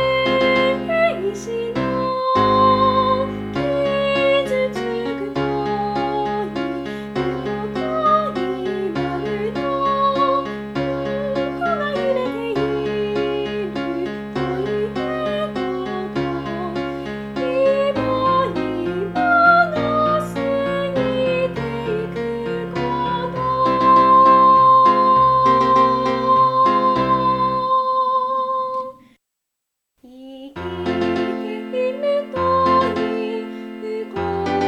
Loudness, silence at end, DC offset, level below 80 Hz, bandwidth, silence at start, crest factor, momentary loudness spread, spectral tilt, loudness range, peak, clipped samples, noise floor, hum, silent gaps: -19 LUFS; 0 s; under 0.1%; -46 dBFS; 11.5 kHz; 0 s; 16 dB; 11 LU; -6.5 dB/octave; 10 LU; -2 dBFS; under 0.1%; -80 dBFS; none; none